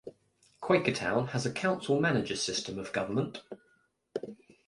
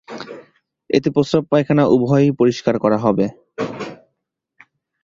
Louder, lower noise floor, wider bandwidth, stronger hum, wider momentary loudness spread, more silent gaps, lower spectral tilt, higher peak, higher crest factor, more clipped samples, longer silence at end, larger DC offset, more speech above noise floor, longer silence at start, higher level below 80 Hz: second, -31 LUFS vs -17 LUFS; second, -71 dBFS vs -75 dBFS; first, 11.5 kHz vs 7.6 kHz; neither; about the same, 18 LU vs 18 LU; neither; second, -4.5 dB/octave vs -7.5 dB/octave; second, -12 dBFS vs 0 dBFS; about the same, 20 dB vs 18 dB; neither; second, 0.35 s vs 1.1 s; neither; second, 40 dB vs 59 dB; about the same, 0.05 s vs 0.1 s; second, -64 dBFS vs -54 dBFS